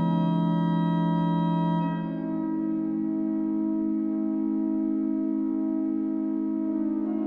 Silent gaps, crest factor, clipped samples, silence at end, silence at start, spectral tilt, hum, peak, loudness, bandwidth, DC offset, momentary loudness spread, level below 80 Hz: none; 12 dB; under 0.1%; 0 s; 0 s; -11 dB/octave; none; -14 dBFS; -27 LUFS; 4.1 kHz; under 0.1%; 3 LU; -62 dBFS